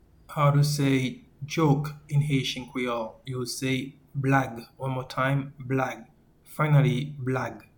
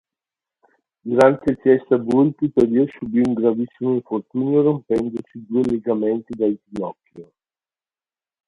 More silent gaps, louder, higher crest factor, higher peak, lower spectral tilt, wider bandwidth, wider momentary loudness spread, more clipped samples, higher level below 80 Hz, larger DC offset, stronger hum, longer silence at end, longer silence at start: neither; second, -27 LUFS vs -20 LUFS; about the same, 18 dB vs 20 dB; second, -8 dBFS vs 0 dBFS; second, -6 dB/octave vs -8.5 dB/octave; first, 19 kHz vs 11 kHz; about the same, 13 LU vs 12 LU; neither; about the same, -56 dBFS vs -56 dBFS; neither; neither; second, 0.15 s vs 1.25 s; second, 0.3 s vs 1.05 s